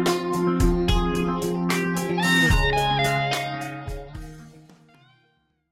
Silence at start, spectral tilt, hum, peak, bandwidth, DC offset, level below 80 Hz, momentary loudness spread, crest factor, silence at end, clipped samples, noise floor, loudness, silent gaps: 0 s; -5 dB/octave; none; -8 dBFS; 16.5 kHz; under 0.1%; -32 dBFS; 17 LU; 16 dB; 1.15 s; under 0.1%; -67 dBFS; -22 LUFS; none